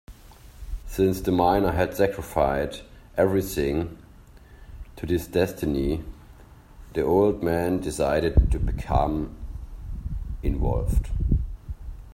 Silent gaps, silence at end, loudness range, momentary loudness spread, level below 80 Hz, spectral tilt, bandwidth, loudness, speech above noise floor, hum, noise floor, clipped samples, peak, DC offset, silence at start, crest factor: none; 0 s; 4 LU; 18 LU; -32 dBFS; -7 dB/octave; 16 kHz; -25 LUFS; 25 dB; none; -48 dBFS; under 0.1%; -6 dBFS; under 0.1%; 0.1 s; 20 dB